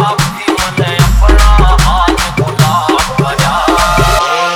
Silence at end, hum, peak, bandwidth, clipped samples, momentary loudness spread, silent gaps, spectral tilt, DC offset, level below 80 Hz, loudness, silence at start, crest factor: 0 s; none; 0 dBFS; 17 kHz; under 0.1%; 5 LU; none; -4.5 dB/octave; under 0.1%; -12 dBFS; -10 LUFS; 0 s; 8 dB